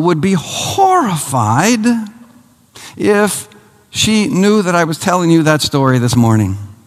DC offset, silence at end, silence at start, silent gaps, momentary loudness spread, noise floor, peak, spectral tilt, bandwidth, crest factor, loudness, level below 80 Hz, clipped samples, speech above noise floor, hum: under 0.1%; 0.1 s; 0 s; none; 8 LU; -46 dBFS; 0 dBFS; -5 dB/octave; 15 kHz; 14 dB; -13 LUFS; -46 dBFS; under 0.1%; 34 dB; none